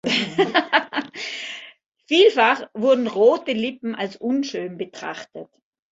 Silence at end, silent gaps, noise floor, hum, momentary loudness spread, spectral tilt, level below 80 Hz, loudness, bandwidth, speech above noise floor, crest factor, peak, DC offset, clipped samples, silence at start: 0.5 s; 1.88-1.92 s; -46 dBFS; none; 16 LU; -4 dB/octave; -70 dBFS; -20 LUFS; 8 kHz; 25 dB; 20 dB; -2 dBFS; under 0.1%; under 0.1%; 0.05 s